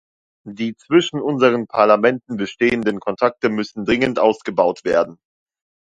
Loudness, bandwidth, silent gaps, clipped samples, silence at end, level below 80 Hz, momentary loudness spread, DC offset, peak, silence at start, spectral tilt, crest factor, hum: -18 LUFS; 8.8 kHz; none; under 0.1%; 0.8 s; -54 dBFS; 11 LU; under 0.1%; 0 dBFS; 0.45 s; -5.5 dB/octave; 18 dB; none